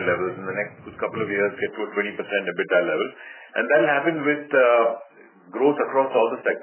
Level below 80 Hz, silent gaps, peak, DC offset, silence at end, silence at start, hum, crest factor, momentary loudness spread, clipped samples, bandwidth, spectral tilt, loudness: -66 dBFS; none; -6 dBFS; under 0.1%; 0 s; 0 s; none; 16 dB; 12 LU; under 0.1%; 3.2 kHz; -9 dB/octave; -22 LUFS